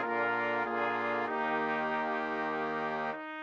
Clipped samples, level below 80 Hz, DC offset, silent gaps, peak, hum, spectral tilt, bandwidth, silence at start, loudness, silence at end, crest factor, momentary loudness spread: under 0.1%; -72 dBFS; under 0.1%; none; -18 dBFS; none; -6 dB/octave; 7.8 kHz; 0 s; -33 LUFS; 0 s; 14 dB; 3 LU